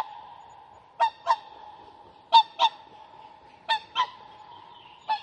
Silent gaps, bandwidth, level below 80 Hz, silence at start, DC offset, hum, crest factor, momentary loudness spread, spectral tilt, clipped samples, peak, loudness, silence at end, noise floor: none; 9.6 kHz; -74 dBFS; 0 s; under 0.1%; none; 24 dB; 27 LU; -0.5 dB/octave; under 0.1%; -6 dBFS; -25 LUFS; 0 s; -51 dBFS